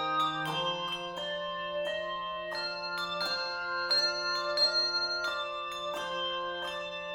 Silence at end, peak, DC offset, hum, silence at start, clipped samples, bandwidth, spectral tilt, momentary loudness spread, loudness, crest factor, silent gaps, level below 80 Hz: 0 s; -18 dBFS; under 0.1%; none; 0 s; under 0.1%; 18 kHz; -2 dB/octave; 9 LU; -31 LUFS; 16 dB; none; -66 dBFS